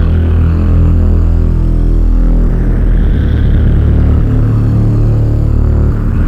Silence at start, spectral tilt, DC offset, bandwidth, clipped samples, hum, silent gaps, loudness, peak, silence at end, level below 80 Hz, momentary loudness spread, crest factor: 0 s; -10 dB/octave; under 0.1%; 3.8 kHz; under 0.1%; none; none; -11 LUFS; -2 dBFS; 0 s; -10 dBFS; 3 LU; 6 dB